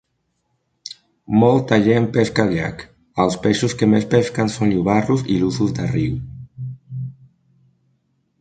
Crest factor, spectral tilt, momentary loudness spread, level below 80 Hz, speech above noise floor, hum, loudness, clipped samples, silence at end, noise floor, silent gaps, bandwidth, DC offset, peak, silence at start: 20 dB; -6.5 dB/octave; 19 LU; -46 dBFS; 53 dB; none; -18 LUFS; under 0.1%; 1.3 s; -70 dBFS; none; 9.2 kHz; under 0.1%; 0 dBFS; 0.9 s